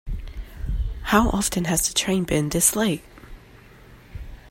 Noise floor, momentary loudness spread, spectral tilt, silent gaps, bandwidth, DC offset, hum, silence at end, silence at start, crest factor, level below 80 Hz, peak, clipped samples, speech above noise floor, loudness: -48 dBFS; 22 LU; -3.5 dB/octave; none; 16.5 kHz; under 0.1%; none; 0 s; 0.05 s; 22 dB; -34 dBFS; -2 dBFS; under 0.1%; 26 dB; -22 LUFS